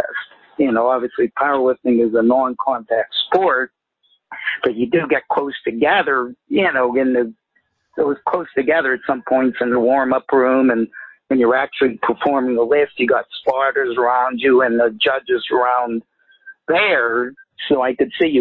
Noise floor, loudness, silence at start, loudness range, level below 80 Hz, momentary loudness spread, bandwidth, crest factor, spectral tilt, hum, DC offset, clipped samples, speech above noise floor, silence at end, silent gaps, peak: -65 dBFS; -17 LUFS; 0 s; 2 LU; -60 dBFS; 7 LU; 4.4 kHz; 14 dB; -8 dB/octave; none; under 0.1%; under 0.1%; 49 dB; 0 s; none; -2 dBFS